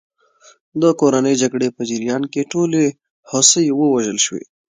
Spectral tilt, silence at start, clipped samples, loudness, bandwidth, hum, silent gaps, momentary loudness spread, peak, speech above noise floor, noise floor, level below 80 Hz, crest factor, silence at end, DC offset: -3.5 dB/octave; 0.75 s; under 0.1%; -16 LUFS; 10 kHz; none; 3.10-3.23 s; 10 LU; 0 dBFS; 35 dB; -51 dBFS; -64 dBFS; 18 dB; 0.35 s; under 0.1%